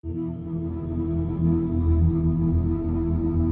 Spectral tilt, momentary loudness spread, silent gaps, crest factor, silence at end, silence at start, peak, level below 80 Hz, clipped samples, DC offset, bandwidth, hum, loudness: -15 dB/octave; 9 LU; none; 12 dB; 0 s; 0.05 s; -10 dBFS; -34 dBFS; under 0.1%; under 0.1%; 2.5 kHz; none; -25 LUFS